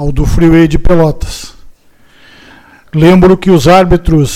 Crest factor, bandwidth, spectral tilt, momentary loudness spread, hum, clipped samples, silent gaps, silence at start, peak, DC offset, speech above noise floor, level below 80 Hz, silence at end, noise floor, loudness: 8 dB; 15.5 kHz; -7 dB/octave; 14 LU; none; 1%; none; 0 s; 0 dBFS; under 0.1%; 36 dB; -18 dBFS; 0 s; -42 dBFS; -7 LUFS